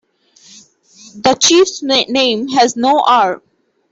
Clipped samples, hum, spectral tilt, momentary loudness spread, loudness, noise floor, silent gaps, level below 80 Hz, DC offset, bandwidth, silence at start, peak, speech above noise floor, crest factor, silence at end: under 0.1%; none; -2 dB/octave; 7 LU; -12 LUFS; -47 dBFS; none; -58 dBFS; under 0.1%; 8.4 kHz; 1.15 s; 0 dBFS; 35 dB; 14 dB; 0.55 s